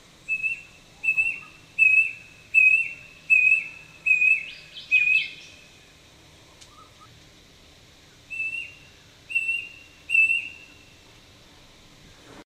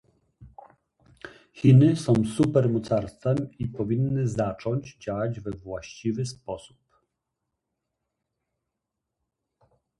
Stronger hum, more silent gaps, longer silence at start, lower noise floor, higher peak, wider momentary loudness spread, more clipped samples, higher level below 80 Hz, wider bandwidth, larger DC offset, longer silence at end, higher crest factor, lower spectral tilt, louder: neither; neither; about the same, 0.3 s vs 0.4 s; second, -52 dBFS vs -84 dBFS; about the same, -8 dBFS vs -6 dBFS; about the same, 21 LU vs 19 LU; neither; second, -62 dBFS vs -56 dBFS; first, 14.5 kHz vs 11.5 kHz; neither; second, 0.05 s vs 3.4 s; about the same, 18 dB vs 20 dB; second, -0.5 dB/octave vs -8 dB/octave; first, -20 LUFS vs -25 LUFS